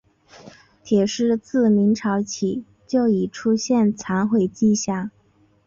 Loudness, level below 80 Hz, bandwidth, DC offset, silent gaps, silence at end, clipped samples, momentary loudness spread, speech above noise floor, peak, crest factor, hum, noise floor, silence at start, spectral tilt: -21 LUFS; -60 dBFS; 7.6 kHz; under 0.1%; none; 0.55 s; under 0.1%; 7 LU; 39 dB; -8 dBFS; 14 dB; none; -59 dBFS; 0.45 s; -5.5 dB/octave